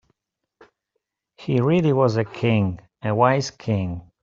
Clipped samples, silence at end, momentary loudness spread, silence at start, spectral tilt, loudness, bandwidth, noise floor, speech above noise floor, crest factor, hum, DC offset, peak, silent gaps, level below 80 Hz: under 0.1%; 0.2 s; 9 LU; 1.4 s; -7 dB/octave; -21 LUFS; 7.6 kHz; -78 dBFS; 58 dB; 20 dB; none; under 0.1%; -4 dBFS; none; -56 dBFS